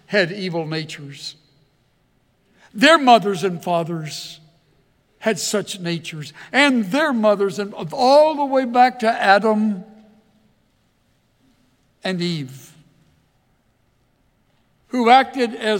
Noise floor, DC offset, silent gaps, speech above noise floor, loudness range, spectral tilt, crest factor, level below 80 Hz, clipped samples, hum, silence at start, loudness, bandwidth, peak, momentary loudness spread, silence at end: -63 dBFS; under 0.1%; none; 45 dB; 14 LU; -4.5 dB/octave; 20 dB; -68 dBFS; under 0.1%; none; 0.1 s; -18 LUFS; 17 kHz; 0 dBFS; 18 LU; 0 s